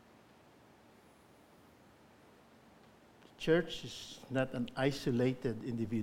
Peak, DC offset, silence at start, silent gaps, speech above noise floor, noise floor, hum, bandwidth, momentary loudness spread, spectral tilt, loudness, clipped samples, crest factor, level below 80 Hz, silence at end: -18 dBFS; under 0.1%; 3.4 s; none; 28 dB; -62 dBFS; none; 16.5 kHz; 11 LU; -6 dB/octave; -36 LUFS; under 0.1%; 20 dB; -64 dBFS; 0 s